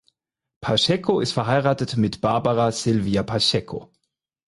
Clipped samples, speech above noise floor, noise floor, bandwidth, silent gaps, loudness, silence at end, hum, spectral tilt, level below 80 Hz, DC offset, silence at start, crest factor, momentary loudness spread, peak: under 0.1%; 53 dB; -74 dBFS; 11.5 kHz; none; -21 LUFS; 0.65 s; none; -5 dB/octave; -50 dBFS; under 0.1%; 0.6 s; 18 dB; 6 LU; -6 dBFS